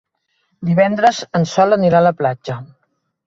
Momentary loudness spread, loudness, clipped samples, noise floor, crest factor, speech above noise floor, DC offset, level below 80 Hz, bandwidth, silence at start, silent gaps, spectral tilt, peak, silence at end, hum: 14 LU; -15 LUFS; under 0.1%; -68 dBFS; 16 dB; 53 dB; under 0.1%; -56 dBFS; 7.8 kHz; 0.6 s; none; -6.5 dB/octave; -2 dBFS; 0.6 s; none